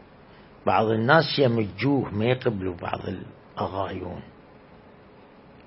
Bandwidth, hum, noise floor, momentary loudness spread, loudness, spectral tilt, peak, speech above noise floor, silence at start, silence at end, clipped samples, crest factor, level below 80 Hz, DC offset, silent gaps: 5.8 kHz; none; -50 dBFS; 16 LU; -25 LUFS; -10.5 dB/octave; -2 dBFS; 26 dB; 0.65 s; 1.35 s; under 0.1%; 24 dB; -58 dBFS; under 0.1%; none